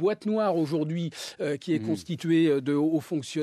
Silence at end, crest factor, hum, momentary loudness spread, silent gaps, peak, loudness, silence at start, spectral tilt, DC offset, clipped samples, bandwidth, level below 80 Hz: 0 s; 12 dB; none; 8 LU; none; -14 dBFS; -27 LUFS; 0 s; -6.5 dB/octave; under 0.1%; under 0.1%; 13.5 kHz; -76 dBFS